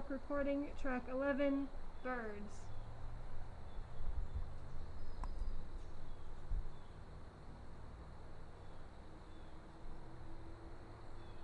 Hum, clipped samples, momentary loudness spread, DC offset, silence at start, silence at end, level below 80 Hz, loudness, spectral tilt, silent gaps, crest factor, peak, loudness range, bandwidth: none; under 0.1%; 17 LU; under 0.1%; 0 s; 0 s; -48 dBFS; -47 LUFS; -7.5 dB/octave; none; 16 dB; -26 dBFS; 14 LU; 7 kHz